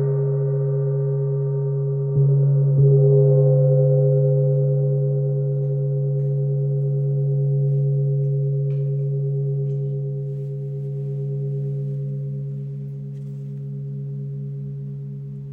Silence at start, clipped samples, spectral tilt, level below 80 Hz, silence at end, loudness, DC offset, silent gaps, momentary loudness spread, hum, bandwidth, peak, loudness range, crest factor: 0 s; under 0.1%; -14 dB/octave; -58 dBFS; 0 s; -21 LUFS; under 0.1%; none; 14 LU; none; 1.5 kHz; -6 dBFS; 11 LU; 14 dB